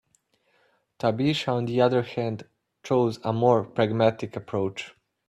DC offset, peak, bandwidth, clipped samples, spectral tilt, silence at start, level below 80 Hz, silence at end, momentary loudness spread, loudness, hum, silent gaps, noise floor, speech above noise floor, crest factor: under 0.1%; -6 dBFS; 12 kHz; under 0.1%; -7 dB/octave; 1.05 s; -64 dBFS; 0.4 s; 13 LU; -25 LUFS; none; none; -68 dBFS; 44 dB; 20 dB